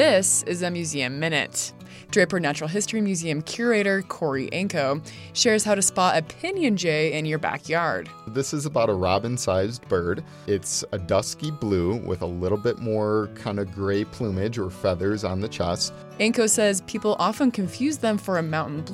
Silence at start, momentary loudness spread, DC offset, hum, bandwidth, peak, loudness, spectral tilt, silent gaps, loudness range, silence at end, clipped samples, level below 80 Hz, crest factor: 0 s; 8 LU; under 0.1%; none; 16 kHz; -6 dBFS; -24 LUFS; -4 dB/octave; none; 3 LU; 0 s; under 0.1%; -54 dBFS; 18 dB